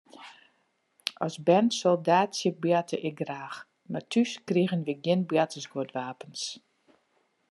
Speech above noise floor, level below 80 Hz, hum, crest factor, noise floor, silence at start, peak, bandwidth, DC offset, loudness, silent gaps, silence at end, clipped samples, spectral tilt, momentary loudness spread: 45 dB; -80 dBFS; none; 24 dB; -72 dBFS; 0.15 s; -6 dBFS; 12 kHz; under 0.1%; -28 LUFS; none; 0.9 s; under 0.1%; -5.5 dB/octave; 15 LU